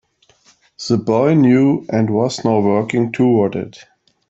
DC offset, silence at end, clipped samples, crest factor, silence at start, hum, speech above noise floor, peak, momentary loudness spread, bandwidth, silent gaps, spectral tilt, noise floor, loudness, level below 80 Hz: under 0.1%; 0.6 s; under 0.1%; 14 dB; 0.8 s; none; 39 dB; -2 dBFS; 8 LU; 8 kHz; none; -7 dB/octave; -54 dBFS; -15 LUFS; -58 dBFS